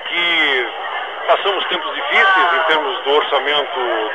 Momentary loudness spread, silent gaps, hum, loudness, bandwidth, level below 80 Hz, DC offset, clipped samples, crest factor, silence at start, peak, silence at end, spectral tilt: 9 LU; none; none; -15 LUFS; 10 kHz; -72 dBFS; 0.4%; under 0.1%; 16 dB; 0 s; 0 dBFS; 0 s; -2.5 dB/octave